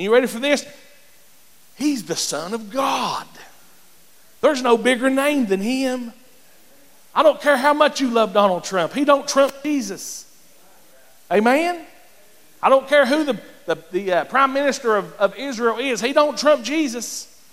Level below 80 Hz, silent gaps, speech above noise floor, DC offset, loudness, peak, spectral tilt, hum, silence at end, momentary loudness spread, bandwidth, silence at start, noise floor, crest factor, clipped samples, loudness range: -64 dBFS; none; 34 dB; 0.4%; -19 LUFS; -2 dBFS; -3.5 dB/octave; none; 0.3 s; 11 LU; 16 kHz; 0 s; -53 dBFS; 18 dB; under 0.1%; 6 LU